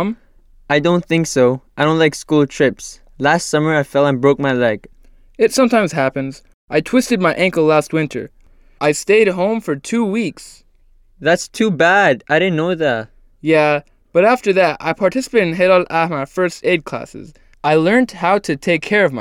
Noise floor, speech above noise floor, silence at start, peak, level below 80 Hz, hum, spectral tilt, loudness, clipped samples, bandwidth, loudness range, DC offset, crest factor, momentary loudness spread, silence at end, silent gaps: -50 dBFS; 35 dB; 0 s; -2 dBFS; -50 dBFS; none; -5 dB/octave; -16 LUFS; under 0.1%; 16 kHz; 2 LU; under 0.1%; 14 dB; 9 LU; 0 s; 6.54-6.68 s